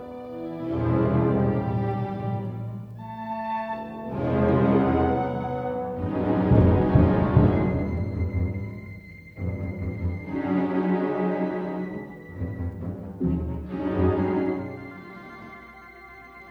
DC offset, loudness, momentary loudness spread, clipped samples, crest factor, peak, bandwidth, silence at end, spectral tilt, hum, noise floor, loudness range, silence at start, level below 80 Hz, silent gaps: under 0.1%; -25 LUFS; 20 LU; under 0.1%; 20 dB; -4 dBFS; 5.2 kHz; 0 s; -10.5 dB/octave; none; -45 dBFS; 7 LU; 0 s; -38 dBFS; none